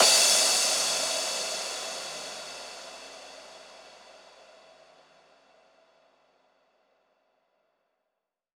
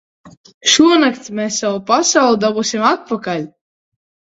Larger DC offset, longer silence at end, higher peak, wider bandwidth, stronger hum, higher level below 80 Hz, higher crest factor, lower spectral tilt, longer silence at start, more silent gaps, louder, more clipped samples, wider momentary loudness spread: neither; first, 4.4 s vs 0.85 s; second, -6 dBFS vs 0 dBFS; first, over 20 kHz vs 8 kHz; neither; second, -74 dBFS vs -58 dBFS; first, 24 dB vs 16 dB; second, 2 dB/octave vs -2.5 dB/octave; second, 0 s vs 0.25 s; second, none vs 0.37-0.44 s, 0.54-0.61 s; second, -24 LUFS vs -14 LUFS; neither; first, 27 LU vs 12 LU